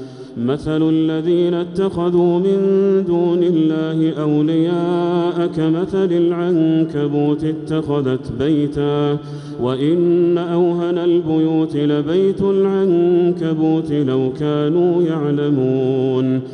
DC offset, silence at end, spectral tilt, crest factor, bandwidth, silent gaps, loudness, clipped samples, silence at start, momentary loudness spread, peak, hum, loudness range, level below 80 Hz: under 0.1%; 0 s; -9 dB/octave; 10 dB; 9.2 kHz; none; -17 LUFS; under 0.1%; 0 s; 4 LU; -6 dBFS; none; 2 LU; -50 dBFS